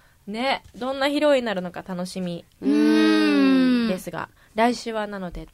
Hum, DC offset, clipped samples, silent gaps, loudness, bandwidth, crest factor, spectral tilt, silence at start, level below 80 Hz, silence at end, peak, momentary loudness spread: none; under 0.1%; under 0.1%; none; -22 LUFS; 14.5 kHz; 16 dB; -5.5 dB/octave; 0.25 s; -52 dBFS; 0.1 s; -6 dBFS; 14 LU